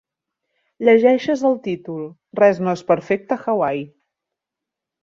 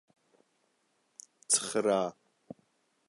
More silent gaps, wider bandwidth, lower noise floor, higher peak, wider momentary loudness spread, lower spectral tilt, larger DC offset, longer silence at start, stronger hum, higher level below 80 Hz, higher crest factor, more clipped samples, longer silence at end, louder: neither; second, 7.6 kHz vs 11.5 kHz; first, -85 dBFS vs -75 dBFS; first, -2 dBFS vs -12 dBFS; second, 16 LU vs 25 LU; first, -7 dB/octave vs -2 dB/octave; neither; second, 0.8 s vs 1.5 s; neither; first, -66 dBFS vs -82 dBFS; second, 18 dB vs 24 dB; neither; first, 1.2 s vs 0.95 s; first, -18 LUFS vs -29 LUFS